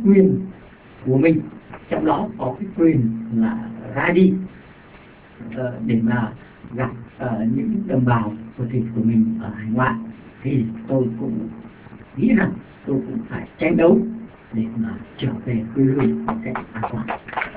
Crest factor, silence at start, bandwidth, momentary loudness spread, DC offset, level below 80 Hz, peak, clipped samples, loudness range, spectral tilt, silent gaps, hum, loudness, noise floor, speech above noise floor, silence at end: 18 dB; 0 s; 4 kHz; 14 LU; under 0.1%; -48 dBFS; -2 dBFS; under 0.1%; 3 LU; -12 dB/octave; none; none; -21 LUFS; -45 dBFS; 25 dB; 0 s